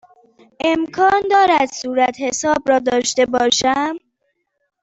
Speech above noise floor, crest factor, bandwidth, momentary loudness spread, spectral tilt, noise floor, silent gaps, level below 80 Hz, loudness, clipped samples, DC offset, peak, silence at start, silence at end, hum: 54 dB; 16 dB; 8.4 kHz; 7 LU; -2 dB/octave; -70 dBFS; none; -54 dBFS; -16 LUFS; under 0.1%; under 0.1%; -2 dBFS; 0.65 s; 0.85 s; none